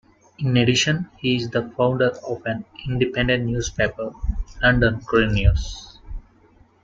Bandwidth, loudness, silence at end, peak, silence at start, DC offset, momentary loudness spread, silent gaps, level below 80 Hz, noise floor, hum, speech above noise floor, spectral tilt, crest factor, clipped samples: 7.8 kHz; -21 LUFS; 0.65 s; -4 dBFS; 0.4 s; under 0.1%; 12 LU; none; -32 dBFS; -54 dBFS; none; 34 dB; -5 dB/octave; 18 dB; under 0.1%